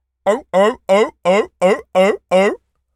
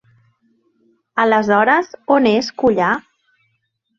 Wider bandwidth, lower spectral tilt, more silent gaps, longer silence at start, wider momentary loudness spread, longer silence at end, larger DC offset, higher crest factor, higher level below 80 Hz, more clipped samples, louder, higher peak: first, 12.5 kHz vs 7.4 kHz; about the same, -5 dB/octave vs -5.5 dB/octave; neither; second, 0.25 s vs 1.15 s; about the same, 5 LU vs 5 LU; second, 0.4 s vs 1 s; neither; about the same, 14 dB vs 16 dB; about the same, -58 dBFS vs -58 dBFS; neither; about the same, -16 LUFS vs -16 LUFS; about the same, -2 dBFS vs -2 dBFS